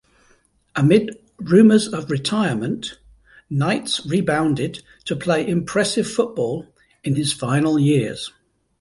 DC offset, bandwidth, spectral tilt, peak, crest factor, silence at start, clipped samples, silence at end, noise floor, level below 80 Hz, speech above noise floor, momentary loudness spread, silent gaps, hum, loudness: under 0.1%; 11.5 kHz; -5.5 dB/octave; -2 dBFS; 18 dB; 0.75 s; under 0.1%; 0.5 s; -59 dBFS; -54 dBFS; 40 dB; 15 LU; none; none; -19 LUFS